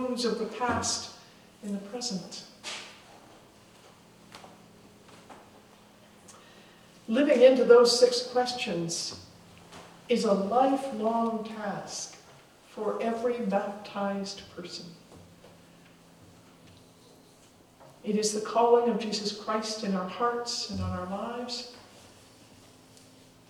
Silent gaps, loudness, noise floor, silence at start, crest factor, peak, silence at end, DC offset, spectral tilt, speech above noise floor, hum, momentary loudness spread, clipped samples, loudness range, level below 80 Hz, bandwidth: none; -28 LUFS; -57 dBFS; 0 s; 24 dB; -6 dBFS; 1.7 s; under 0.1%; -4 dB/octave; 30 dB; none; 21 LU; under 0.1%; 17 LU; -68 dBFS; 13.5 kHz